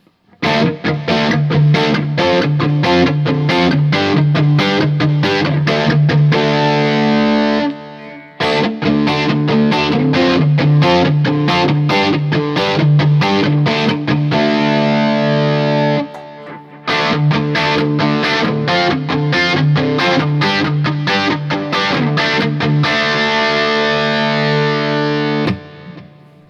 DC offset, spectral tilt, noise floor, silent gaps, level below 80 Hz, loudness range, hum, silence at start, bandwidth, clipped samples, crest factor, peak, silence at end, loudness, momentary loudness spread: under 0.1%; -6.5 dB/octave; -40 dBFS; none; -50 dBFS; 2 LU; none; 0.4 s; 7.2 kHz; under 0.1%; 14 dB; 0 dBFS; 0.45 s; -14 LUFS; 4 LU